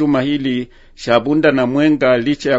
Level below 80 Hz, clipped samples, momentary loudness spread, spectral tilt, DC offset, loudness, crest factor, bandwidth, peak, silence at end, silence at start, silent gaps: -46 dBFS; under 0.1%; 10 LU; -6.5 dB/octave; under 0.1%; -15 LUFS; 14 dB; 8 kHz; 0 dBFS; 0 s; 0 s; none